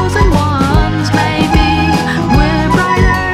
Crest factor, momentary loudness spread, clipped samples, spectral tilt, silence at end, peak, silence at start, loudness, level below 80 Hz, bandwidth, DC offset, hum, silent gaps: 10 dB; 2 LU; under 0.1%; -6 dB/octave; 0 s; 0 dBFS; 0 s; -11 LUFS; -18 dBFS; 15 kHz; under 0.1%; none; none